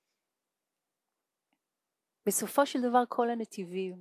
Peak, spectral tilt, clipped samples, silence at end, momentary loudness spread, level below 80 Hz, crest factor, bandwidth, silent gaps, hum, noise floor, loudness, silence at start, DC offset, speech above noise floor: -12 dBFS; -3.5 dB/octave; under 0.1%; 0 s; 9 LU; -90 dBFS; 22 dB; 16 kHz; none; none; -88 dBFS; -31 LUFS; 2.25 s; under 0.1%; 58 dB